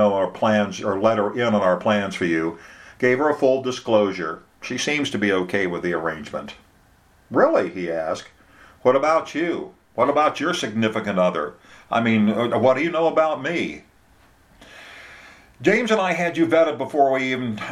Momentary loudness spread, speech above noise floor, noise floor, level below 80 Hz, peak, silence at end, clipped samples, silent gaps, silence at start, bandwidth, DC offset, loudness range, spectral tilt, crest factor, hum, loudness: 12 LU; 35 dB; -55 dBFS; -60 dBFS; -2 dBFS; 0 s; under 0.1%; none; 0 s; 13 kHz; under 0.1%; 3 LU; -5.5 dB/octave; 20 dB; none; -21 LUFS